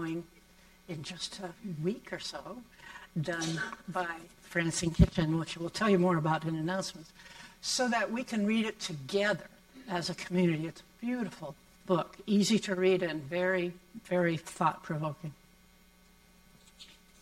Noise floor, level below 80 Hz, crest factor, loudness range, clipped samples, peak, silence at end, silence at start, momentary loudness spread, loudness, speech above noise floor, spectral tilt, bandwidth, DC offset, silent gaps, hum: -61 dBFS; -48 dBFS; 26 dB; 7 LU; under 0.1%; -8 dBFS; 0.3 s; 0 s; 20 LU; -32 LUFS; 29 dB; -5 dB/octave; 15.5 kHz; under 0.1%; none; none